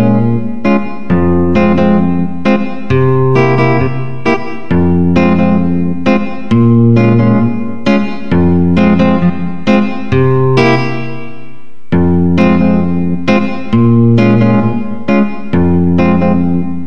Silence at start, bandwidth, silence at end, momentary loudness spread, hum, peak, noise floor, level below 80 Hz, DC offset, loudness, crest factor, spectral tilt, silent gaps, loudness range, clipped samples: 0 s; 6.6 kHz; 0 s; 7 LU; none; 0 dBFS; -38 dBFS; -34 dBFS; 10%; -11 LUFS; 12 dB; -9 dB/octave; none; 2 LU; under 0.1%